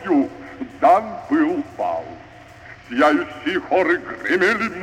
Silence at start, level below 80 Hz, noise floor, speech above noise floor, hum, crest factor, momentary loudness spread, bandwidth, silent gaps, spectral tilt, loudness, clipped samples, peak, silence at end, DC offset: 0 s; -56 dBFS; -42 dBFS; 23 dB; none; 18 dB; 17 LU; 11 kHz; none; -5.5 dB/octave; -20 LUFS; under 0.1%; -4 dBFS; 0 s; under 0.1%